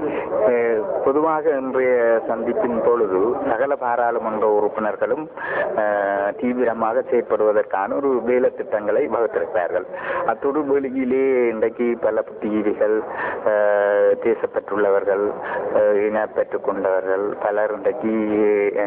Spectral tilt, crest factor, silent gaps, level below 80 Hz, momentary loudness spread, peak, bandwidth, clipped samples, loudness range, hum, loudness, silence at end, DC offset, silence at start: -10 dB/octave; 14 dB; none; -58 dBFS; 5 LU; -6 dBFS; 4 kHz; under 0.1%; 2 LU; none; -20 LUFS; 0 s; under 0.1%; 0 s